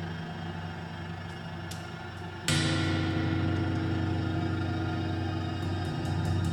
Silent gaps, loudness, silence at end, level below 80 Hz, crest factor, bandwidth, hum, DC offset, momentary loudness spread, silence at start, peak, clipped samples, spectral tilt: none; -32 LUFS; 0 s; -54 dBFS; 20 dB; 14 kHz; none; under 0.1%; 11 LU; 0 s; -10 dBFS; under 0.1%; -5.5 dB/octave